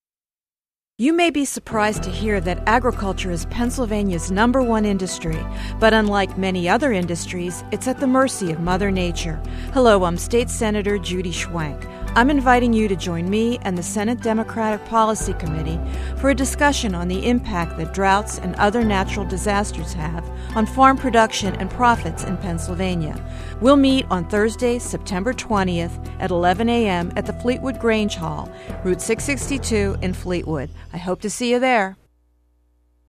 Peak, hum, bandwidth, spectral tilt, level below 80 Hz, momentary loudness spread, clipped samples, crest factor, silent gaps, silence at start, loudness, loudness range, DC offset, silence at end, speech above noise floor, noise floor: 0 dBFS; none; 14 kHz; -5 dB/octave; -32 dBFS; 11 LU; under 0.1%; 20 dB; none; 1 s; -20 LUFS; 3 LU; under 0.1%; 1.2 s; over 70 dB; under -90 dBFS